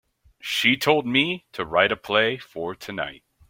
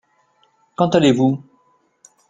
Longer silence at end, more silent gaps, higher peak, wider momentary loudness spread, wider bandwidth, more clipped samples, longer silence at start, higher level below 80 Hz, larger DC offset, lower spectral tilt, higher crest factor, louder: second, 0.3 s vs 0.9 s; neither; about the same, -2 dBFS vs -2 dBFS; about the same, 13 LU vs 15 LU; first, 16.5 kHz vs 9.4 kHz; neither; second, 0.45 s vs 0.8 s; about the same, -60 dBFS vs -56 dBFS; neither; second, -4 dB/octave vs -6.5 dB/octave; about the same, 22 dB vs 20 dB; second, -22 LUFS vs -17 LUFS